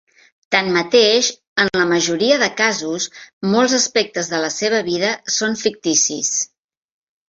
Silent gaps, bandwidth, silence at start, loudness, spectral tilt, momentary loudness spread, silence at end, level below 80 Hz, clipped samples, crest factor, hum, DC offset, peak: 1.47-1.56 s, 3.33-3.41 s; 8.2 kHz; 0.5 s; -17 LUFS; -2 dB/octave; 7 LU; 0.85 s; -62 dBFS; under 0.1%; 16 dB; none; under 0.1%; -2 dBFS